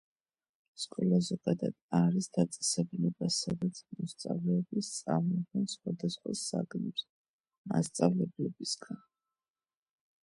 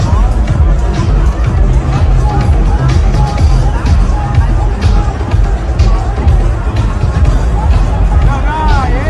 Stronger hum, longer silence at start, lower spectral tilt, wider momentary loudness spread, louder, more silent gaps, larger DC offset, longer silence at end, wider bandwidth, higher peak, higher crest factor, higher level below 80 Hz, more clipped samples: neither; first, 0.8 s vs 0 s; second, -5.5 dB/octave vs -7 dB/octave; first, 10 LU vs 2 LU; second, -33 LUFS vs -12 LUFS; first, 1.82-1.89 s, 7.09-7.39 s, 7.58-7.64 s vs none; neither; first, 1.3 s vs 0 s; first, 11.5 kHz vs 9.2 kHz; second, -12 dBFS vs 0 dBFS; first, 22 dB vs 8 dB; second, -72 dBFS vs -10 dBFS; neither